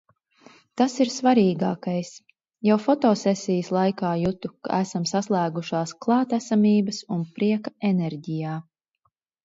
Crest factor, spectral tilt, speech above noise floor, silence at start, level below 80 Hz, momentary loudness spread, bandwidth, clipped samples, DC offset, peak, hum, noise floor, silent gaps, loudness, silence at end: 16 dB; -6.5 dB/octave; 50 dB; 0.75 s; -62 dBFS; 10 LU; 7.8 kHz; under 0.1%; under 0.1%; -8 dBFS; none; -73 dBFS; none; -24 LUFS; 0.85 s